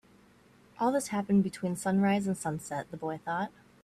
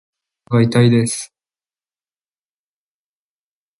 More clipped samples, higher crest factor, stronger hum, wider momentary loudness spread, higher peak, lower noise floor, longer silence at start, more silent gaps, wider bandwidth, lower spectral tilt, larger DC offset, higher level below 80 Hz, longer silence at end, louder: neither; about the same, 14 dB vs 18 dB; neither; second, 10 LU vs 13 LU; second, -16 dBFS vs -2 dBFS; second, -60 dBFS vs under -90 dBFS; first, 0.8 s vs 0.5 s; neither; first, 13.5 kHz vs 11.5 kHz; about the same, -6 dB/octave vs -6 dB/octave; neither; second, -68 dBFS vs -56 dBFS; second, 0.35 s vs 2.55 s; second, -31 LUFS vs -16 LUFS